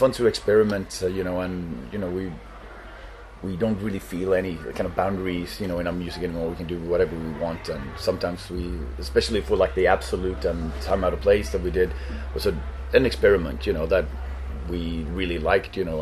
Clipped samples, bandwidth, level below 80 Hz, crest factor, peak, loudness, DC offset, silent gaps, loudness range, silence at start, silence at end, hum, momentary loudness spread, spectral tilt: under 0.1%; 13.5 kHz; -36 dBFS; 20 dB; -4 dBFS; -25 LUFS; under 0.1%; none; 6 LU; 0 s; 0 s; none; 12 LU; -6 dB/octave